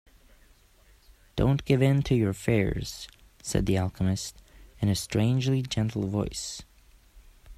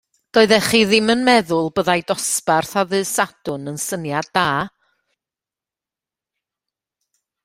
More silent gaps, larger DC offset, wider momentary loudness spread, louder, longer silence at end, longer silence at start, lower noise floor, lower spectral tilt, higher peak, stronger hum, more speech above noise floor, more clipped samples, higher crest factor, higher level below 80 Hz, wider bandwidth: neither; neither; first, 14 LU vs 10 LU; second, -27 LUFS vs -18 LUFS; second, 0.05 s vs 2.75 s; first, 1.35 s vs 0.35 s; second, -59 dBFS vs -89 dBFS; first, -6 dB/octave vs -3.5 dB/octave; second, -8 dBFS vs 0 dBFS; neither; second, 33 dB vs 72 dB; neither; about the same, 20 dB vs 20 dB; first, -44 dBFS vs -56 dBFS; second, 14.5 kHz vs 16 kHz